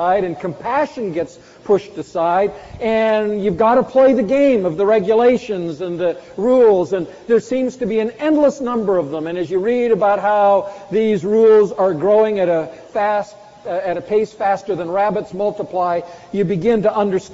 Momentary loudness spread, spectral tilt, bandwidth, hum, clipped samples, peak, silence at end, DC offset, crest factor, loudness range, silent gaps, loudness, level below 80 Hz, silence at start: 10 LU; -5.5 dB/octave; 7.8 kHz; none; under 0.1%; -4 dBFS; 0 s; under 0.1%; 12 dB; 5 LU; none; -17 LUFS; -52 dBFS; 0 s